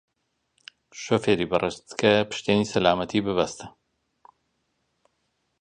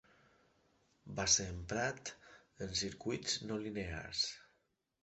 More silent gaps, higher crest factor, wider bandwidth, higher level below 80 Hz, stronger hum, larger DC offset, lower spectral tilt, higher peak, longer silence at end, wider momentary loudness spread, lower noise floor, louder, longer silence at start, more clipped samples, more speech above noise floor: neither; about the same, 24 dB vs 24 dB; first, 10 kHz vs 8.2 kHz; about the same, -56 dBFS vs -60 dBFS; neither; neither; first, -5 dB/octave vs -2 dB/octave; first, -4 dBFS vs -18 dBFS; first, 1.9 s vs 0.6 s; about the same, 18 LU vs 17 LU; second, -76 dBFS vs -80 dBFS; first, -24 LUFS vs -38 LUFS; about the same, 0.95 s vs 1.05 s; neither; first, 52 dB vs 41 dB